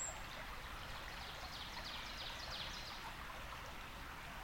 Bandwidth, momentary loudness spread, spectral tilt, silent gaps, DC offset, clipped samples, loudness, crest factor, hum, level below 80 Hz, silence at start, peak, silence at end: 17.5 kHz; 5 LU; -2 dB/octave; none; under 0.1%; under 0.1%; -48 LUFS; 14 dB; none; -56 dBFS; 0 s; -34 dBFS; 0 s